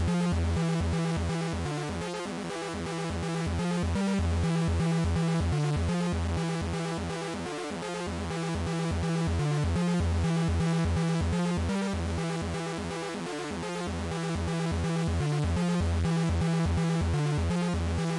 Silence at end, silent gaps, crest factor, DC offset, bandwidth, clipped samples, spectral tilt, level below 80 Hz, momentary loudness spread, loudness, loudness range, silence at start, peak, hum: 0 s; none; 10 dB; under 0.1%; 11.5 kHz; under 0.1%; -6.5 dB/octave; -42 dBFS; 6 LU; -30 LUFS; 4 LU; 0 s; -18 dBFS; none